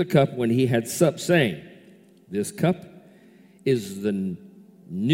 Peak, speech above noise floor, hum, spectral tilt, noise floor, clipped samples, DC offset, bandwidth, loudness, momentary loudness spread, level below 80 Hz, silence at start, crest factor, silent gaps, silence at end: -4 dBFS; 30 dB; none; -6 dB/octave; -52 dBFS; under 0.1%; under 0.1%; 16.5 kHz; -24 LUFS; 12 LU; -62 dBFS; 0 s; 20 dB; none; 0 s